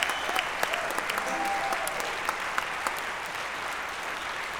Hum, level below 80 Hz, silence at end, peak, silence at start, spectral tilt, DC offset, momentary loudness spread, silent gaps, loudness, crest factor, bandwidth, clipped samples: none; -58 dBFS; 0 s; -6 dBFS; 0 s; -1 dB/octave; under 0.1%; 5 LU; none; -30 LUFS; 24 dB; 19 kHz; under 0.1%